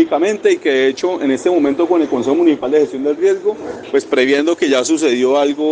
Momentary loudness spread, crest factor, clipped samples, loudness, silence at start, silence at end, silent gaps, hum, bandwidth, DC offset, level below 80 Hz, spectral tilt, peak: 4 LU; 14 dB; under 0.1%; -15 LUFS; 0 s; 0 s; none; none; 9.8 kHz; under 0.1%; -60 dBFS; -4 dB/octave; -2 dBFS